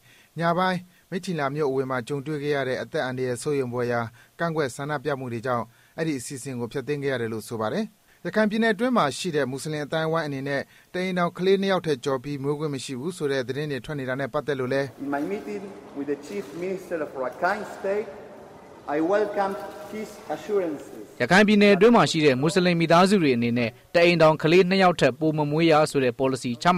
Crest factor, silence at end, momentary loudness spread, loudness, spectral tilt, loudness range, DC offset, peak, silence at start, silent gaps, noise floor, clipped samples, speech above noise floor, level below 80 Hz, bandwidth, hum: 16 dB; 0 s; 15 LU; -24 LUFS; -5.5 dB/octave; 10 LU; under 0.1%; -8 dBFS; 0.35 s; none; -45 dBFS; under 0.1%; 22 dB; -60 dBFS; 16 kHz; none